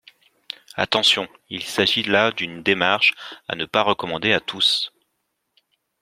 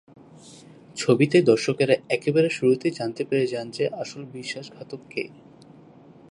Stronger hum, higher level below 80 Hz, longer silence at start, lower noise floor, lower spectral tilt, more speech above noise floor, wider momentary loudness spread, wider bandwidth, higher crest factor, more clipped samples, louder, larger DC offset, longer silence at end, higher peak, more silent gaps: neither; first, -62 dBFS vs -70 dBFS; first, 0.75 s vs 0.45 s; first, -74 dBFS vs -49 dBFS; second, -3 dB/octave vs -5.5 dB/octave; first, 53 dB vs 26 dB; second, 14 LU vs 17 LU; first, 16 kHz vs 11.5 kHz; about the same, 22 dB vs 20 dB; neither; first, -19 LUFS vs -23 LUFS; neither; about the same, 1.15 s vs 1.05 s; about the same, -2 dBFS vs -4 dBFS; neither